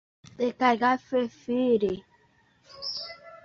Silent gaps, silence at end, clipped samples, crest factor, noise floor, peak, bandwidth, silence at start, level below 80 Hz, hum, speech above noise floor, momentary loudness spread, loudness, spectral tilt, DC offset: none; 0.1 s; under 0.1%; 20 dB; -64 dBFS; -8 dBFS; 7 kHz; 0.4 s; -64 dBFS; none; 38 dB; 13 LU; -27 LUFS; -5.5 dB/octave; under 0.1%